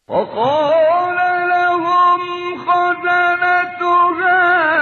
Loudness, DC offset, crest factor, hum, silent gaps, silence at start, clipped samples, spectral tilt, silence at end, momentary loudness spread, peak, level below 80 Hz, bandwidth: -14 LUFS; under 0.1%; 10 dB; none; none; 0.1 s; under 0.1%; -5.5 dB/octave; 0 s; 5 LU; -4 dBFS; -60 dBFS; 6.6 kHz